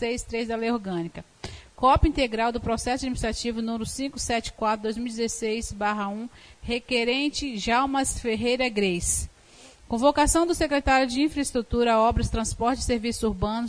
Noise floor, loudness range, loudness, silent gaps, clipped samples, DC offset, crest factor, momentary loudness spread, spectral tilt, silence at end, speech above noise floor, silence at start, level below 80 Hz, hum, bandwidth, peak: -51 dBFS; 5 LU; -25 LUFS; none; under 0.1%; under 0.1%; 18 dB; 10 LU; -4 dB/octave; 0 s; 26 dB; 0 s; -38 dBFS; none; 11 kHz; -8 dBFS